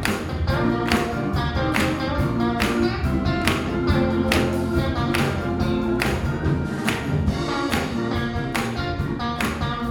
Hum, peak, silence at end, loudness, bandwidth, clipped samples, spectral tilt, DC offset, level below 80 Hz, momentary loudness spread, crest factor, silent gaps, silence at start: none; -2 dBFS; 0 s; -23 LUFS; 19 kHz; under 0.1%; -6 dB/octave; under 0.1%; -32 dBFS; 4 LU; 22 dB; none; 0 s